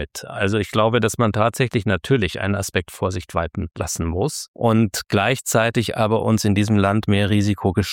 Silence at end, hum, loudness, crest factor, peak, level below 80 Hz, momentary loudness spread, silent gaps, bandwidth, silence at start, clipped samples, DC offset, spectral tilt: 0 s; none; -20 LUFS; 16 dB; -4 dBFS; -42 dBFS; 7 LU; 4.48-4.54 s; 17 kHz; 0 s; under 0.1%; under 0.1%; -5.5 dB/octave